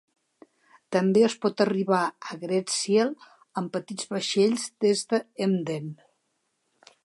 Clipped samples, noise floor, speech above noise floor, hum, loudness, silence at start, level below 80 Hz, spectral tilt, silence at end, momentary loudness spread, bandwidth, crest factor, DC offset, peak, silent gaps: under 0.1%; -75 dBFS; 50 dB; none; -26 LUFS; 0.9 s; -76 dBFS; -4.5 dB/octave; 1.1 s; 11 LU; 11.5 kHz; 18 dB; under 0.1%; -8 dBFS; none